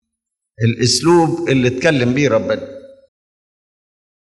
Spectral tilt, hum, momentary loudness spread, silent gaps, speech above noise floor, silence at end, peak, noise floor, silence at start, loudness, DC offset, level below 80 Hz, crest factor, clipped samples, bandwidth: -5 dB/octave; none; 9 LU; none; 64 dB; 1.35 s; 0 dBFS; -79 dBFS; 0.6 s; -15 LUFS; under 0.1%; -54 dBFS; 16 dB; under 0.1%; 12 kHz